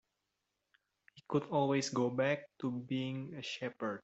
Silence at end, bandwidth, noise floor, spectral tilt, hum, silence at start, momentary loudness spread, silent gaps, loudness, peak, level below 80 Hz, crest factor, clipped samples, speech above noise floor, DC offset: 0.05 s; 8.2 kHz; -86 dBFS; -5.5 dB/octave; none; 1.15 s; 8 LU; none; -36 LUFS; -20 dBFS; -78 dBFS; 18 dB; under 0.1%; 50 dB; under 0.1%